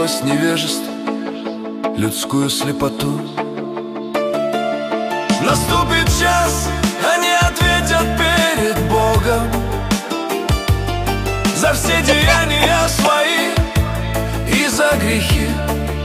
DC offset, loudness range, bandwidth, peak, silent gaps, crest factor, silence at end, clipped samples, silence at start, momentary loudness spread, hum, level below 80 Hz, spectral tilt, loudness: under 0.1%; 5 LU; 15.5 kHz; 0 dBFS; none; 16 dB; 0 s; under 0.1%; 0 s; 9 LU; none; -26 dBFS; -4 dB/octave; -16 LUFS